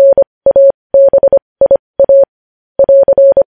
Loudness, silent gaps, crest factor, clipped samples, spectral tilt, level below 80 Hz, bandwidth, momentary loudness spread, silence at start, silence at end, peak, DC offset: -8 LUFS; 0.27-0.41 s, 0.74-0.90 s, 1.42-1.56 s, 1.79-1.94 s, 2.29-2.75 s; 8 dB; under 0.1%; -10.5 dB/octave; -44 dBFS; 1.8 kHz; 4 LU; 0 s; 0.05 s; 0 dBFS; 0.2%